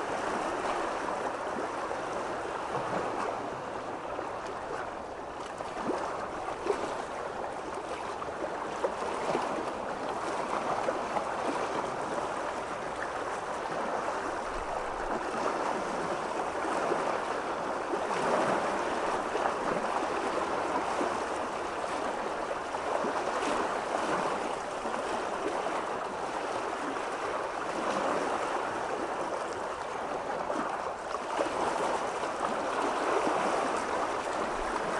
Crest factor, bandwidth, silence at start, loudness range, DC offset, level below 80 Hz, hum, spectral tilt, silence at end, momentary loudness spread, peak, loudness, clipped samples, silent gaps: 20 dB; 11.5 kHz; 0 s; 5 LU; under 0.1%; -58 dBFS; none; -4 dB/octave; 0 s; 6 LU; -12 dBFS; -33 LUFS; under 0.1%; none